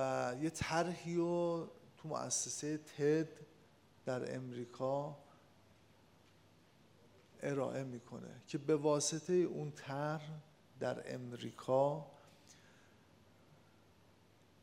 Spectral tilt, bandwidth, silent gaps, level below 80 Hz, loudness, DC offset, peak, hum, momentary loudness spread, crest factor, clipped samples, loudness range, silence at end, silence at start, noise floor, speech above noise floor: -5 dB/octave; 16 kHz; none; -76 dBFS; -39 LUFS; under 0.1%; -20 dBFS; none; 15 LU; 20 dB; under 0.1%; 8 LU; 2.1 s; 0 s; -68 dBFS; 29 dB